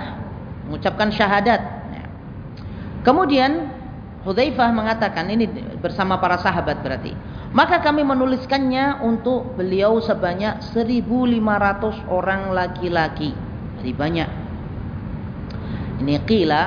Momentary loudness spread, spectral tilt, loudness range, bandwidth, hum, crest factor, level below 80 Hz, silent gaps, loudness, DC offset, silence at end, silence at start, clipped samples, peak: 15 LU; -7.5 dB/octave; 4 LU; 5.2 kHz; none; 20 dB; -40 dBFS; none; -20 LUFS; under 0.1%; 0 s; 0 s; under 0.1%; -2 dBFS